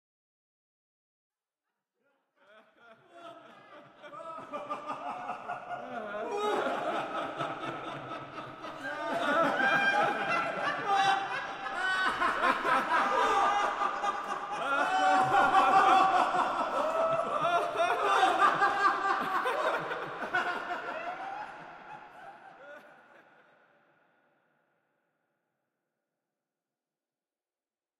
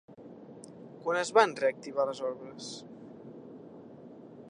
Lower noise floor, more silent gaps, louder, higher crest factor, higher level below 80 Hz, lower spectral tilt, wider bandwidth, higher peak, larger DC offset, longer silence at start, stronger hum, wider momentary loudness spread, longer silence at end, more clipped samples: first, under -90 dBFS vs -50 dBFS; neither; about the same, -29 LUFS vs -30 LUFS; second, 20 dB vs 26 dB; first, -68 dBFS vs -82 dBFS; about the same, -3.5 dB/octave vs -3.5 dB/octave; first, 14.5 kHz vs 10.5 kHz; second, -12 dBFS vs -8 dBFS; neither; first, 2.9 s vs 0.1 s; neither; second, 18 LU vs 25 LU; first, 5.1 s vs 0 s; neither